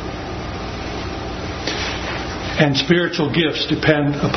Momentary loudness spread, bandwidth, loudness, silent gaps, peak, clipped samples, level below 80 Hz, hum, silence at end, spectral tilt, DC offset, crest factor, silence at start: 11 LU; 6.4 kHz; -20 LUFS; none; 0 dBFS; under 0.1%; -36 dBFS; none; 0 s; -5.5 dB/octave; under 0.1%; 20 dB; 0 s